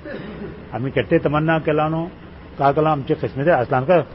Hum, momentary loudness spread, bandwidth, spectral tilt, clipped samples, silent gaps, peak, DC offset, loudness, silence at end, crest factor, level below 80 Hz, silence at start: none; 15 LU; 5.8 kHz; -12 dB/octave; under 0.1%; none; -4 dBFS; 0.1%; -19 LUFS; 0 s; 16 dB; -44 dBFS; 0 s